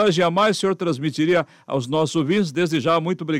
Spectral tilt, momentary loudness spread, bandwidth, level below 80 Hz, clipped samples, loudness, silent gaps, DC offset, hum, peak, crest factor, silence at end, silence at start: -5.5 dB/octave; 5 LU; 14.5 kHz; -64 dBFS; under 0.1%; -21 LUFS; none; under 0.1%; none; -6 dBFS; 14 dB; 0 s; 0 s